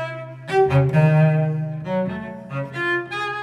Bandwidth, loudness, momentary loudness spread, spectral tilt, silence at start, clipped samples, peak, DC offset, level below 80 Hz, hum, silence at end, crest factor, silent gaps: 8.6 kHz; -20 LUFS; 14 LU; -8.5 dB/octave; 0 s; under 0.1%; -6 dBFS; under 0.1%; -52 dBFS; none; 0 s; 14 dB; none